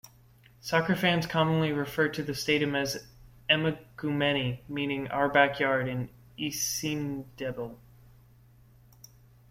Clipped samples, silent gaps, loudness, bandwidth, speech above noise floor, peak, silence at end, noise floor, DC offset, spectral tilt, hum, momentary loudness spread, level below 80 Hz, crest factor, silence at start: under 0.1%; none; -28 LUFS; 16.5 kHz; 29 dB; -8 dBFS; 1.75 s; -58 dBFS; under 0.1%; -4.5 dB/octave; none; 12 LU; -60 dBFS; 22 dB; 0.05 s